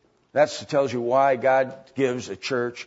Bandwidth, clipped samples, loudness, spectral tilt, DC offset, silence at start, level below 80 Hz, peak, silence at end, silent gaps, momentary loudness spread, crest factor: 8 kHz; under 0.1%; -23 LUFS; -5 dB/octave; under 0.1%; 0.35 s; -70 dBFS; -6 dBFS; 0.05 s; none; 9 LU; 18 dB